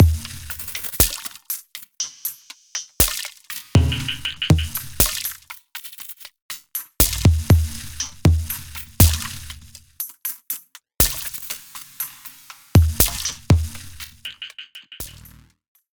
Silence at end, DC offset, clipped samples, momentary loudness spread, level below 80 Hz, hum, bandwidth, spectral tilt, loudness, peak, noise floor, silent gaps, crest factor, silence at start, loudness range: 0.85 s; under 0.1%; under 0.1%; 18 LU; -32 dBFS; none; over 20 kHz; -4 dB/octave; -21 LUFS; 0 dBFS; -48 dBFS; 6.42-6.49 s; 22 dB; 0 s; 4 LU